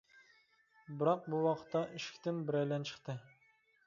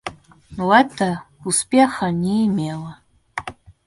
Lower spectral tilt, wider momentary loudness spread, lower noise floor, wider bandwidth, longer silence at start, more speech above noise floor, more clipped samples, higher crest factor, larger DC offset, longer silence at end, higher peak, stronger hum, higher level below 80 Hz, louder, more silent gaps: about the same, -5.5 dB/octave vs -4.5 dB/octave; second, 12 LU vs 19 LU; first, -72 dBFS vs -39 dBFS; second, 7.4 kHz vs 12 kHz; first, 0.9 s vs 0.05 s; first, 35 dB vs 21 dB; neither; about the same, 20 dB vs 20 dB; neither; first, 0.65 s vs 0.35 s; second, -18 dBFS vs 0 dBFS; neither; second, -82 dBFS vs -54 dBFS; second, -38 LUFS vs -19 LUFS; neither